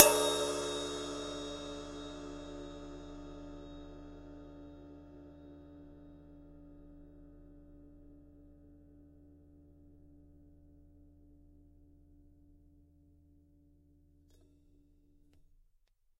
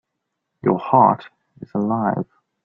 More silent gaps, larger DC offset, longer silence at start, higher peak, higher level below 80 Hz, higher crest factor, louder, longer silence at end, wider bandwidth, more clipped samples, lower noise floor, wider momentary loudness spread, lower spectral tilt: neither; neither; second, 0 s vs 0.65 s; about the same, -2 dBFS vs 0 dBFS; about the same, -60 dBFS vs -60 dBFS; first, 40 dB vs 20 dB; second, -37 LUFS vs -19 LUFS; first, 4.35 s vs 0.4 s; first, 16 kHz vs 5.6 kHz; neither; second, -71 dBFS vs -78 dBFS; first, 25 LU vs 13 LU; second, -2 dB/octave vs -11 dB/octave